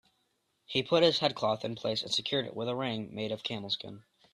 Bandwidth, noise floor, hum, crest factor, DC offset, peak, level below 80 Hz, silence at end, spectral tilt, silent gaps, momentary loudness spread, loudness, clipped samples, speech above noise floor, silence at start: 12 kHz; -77 dBFS; none; 22 dB; under 0.1%; -10 dBFS; -72 dBFS; 0.35 s; -4.5 dB/octave; none; 10 LU; -31 LUFS; under 0.1%; 45 dB; 0.7 s